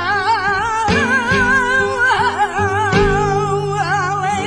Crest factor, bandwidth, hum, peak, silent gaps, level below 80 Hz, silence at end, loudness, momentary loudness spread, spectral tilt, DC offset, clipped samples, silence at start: 14 dB; 10.5 kHz; none; -2 dBFS; none; -34 dBFS; 0 s; -15 LUFS; 4 LU; -4.5 dB/octave; under 0.1%; under 0.1%; 0 s